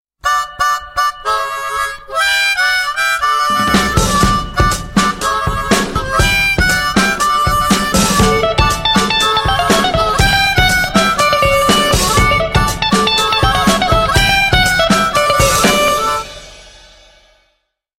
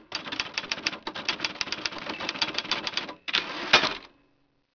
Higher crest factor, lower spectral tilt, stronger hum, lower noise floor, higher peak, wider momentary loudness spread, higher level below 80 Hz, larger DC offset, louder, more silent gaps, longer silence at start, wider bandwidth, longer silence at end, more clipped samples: second, 14 dB vs 28 dB; first, -3.5 dB/octave vs -1.5 dB/octave; neither; second, -65 dBFS vs -69 dBFS; about the same, 0 dBFS vs -2 dBFS; second, 6 LU vs 11 LU; first, -24 dBFS vs -62 dBFS; neither; first, -12 LUFS vs -27 LUFS; neither; first, 0.25 s vs 0 s; first, 16.5 kHz vs 5.4 kHz; first, 1.3 s vs 0.7 s; neither